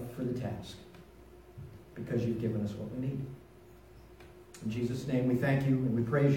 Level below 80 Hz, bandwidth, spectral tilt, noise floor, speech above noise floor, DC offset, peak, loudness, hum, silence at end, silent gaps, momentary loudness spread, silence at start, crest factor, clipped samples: -58 dBFS; 16.5 kHz; -8 dB/octave; -55 dBFS; 24 dB; under 0.1%; -16 dBFS; -33 LUFS; none; 0 s; none; 24 LU; 0 s; 18 dB; under 0.1%